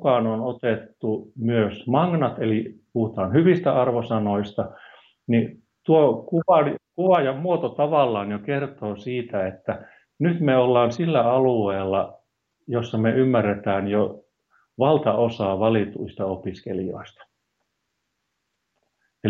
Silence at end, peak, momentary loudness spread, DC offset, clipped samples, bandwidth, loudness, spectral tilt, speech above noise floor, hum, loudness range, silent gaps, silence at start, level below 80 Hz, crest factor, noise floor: 0 s; -6 dBFS; 11 LU; under 0.1%; under 0.1%; 7 kHz; -22 LUFS; -8.5 dB/octave; 55 dB; none; 4 LU; none; 0 s; -66 dBFS; 16 dB; -77 dBFS